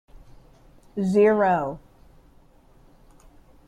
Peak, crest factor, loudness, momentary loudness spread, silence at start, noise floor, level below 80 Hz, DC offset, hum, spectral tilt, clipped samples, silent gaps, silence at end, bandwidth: -8 dBFS; 18 dB; -21 LUFS; 18 LU; 0.15 s; -54 dBFS; -54 dBFS; under 0.1%; none; -8 dB/octave; under 0.1%; none; 1.9 s; 10 kHz